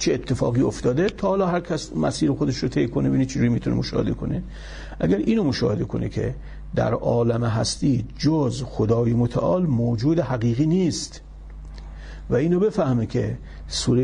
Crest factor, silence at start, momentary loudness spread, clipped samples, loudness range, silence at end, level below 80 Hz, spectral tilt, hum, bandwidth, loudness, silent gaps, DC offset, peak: 14 dB; 0 s; 14 LU; under 0.1%; 3 LU; 0 s; -40 dBFS; -6.5 dB/octave; none; 10.5 kHz; -23 LUFS; none; under 0.1%; -8 dBFS